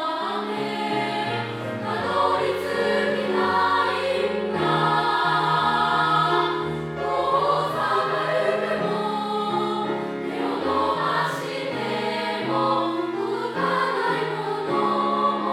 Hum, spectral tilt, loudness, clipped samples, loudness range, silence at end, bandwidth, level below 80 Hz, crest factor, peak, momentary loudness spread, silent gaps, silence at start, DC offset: none; -5.5 dB/octave; -23 LUFS; under 0.1%; 3 LU; 0 s; 16.5 kHz; -60 dBFS; 16 dB; -8 dBFS; 7 LU; none; 0 s; under 0.1%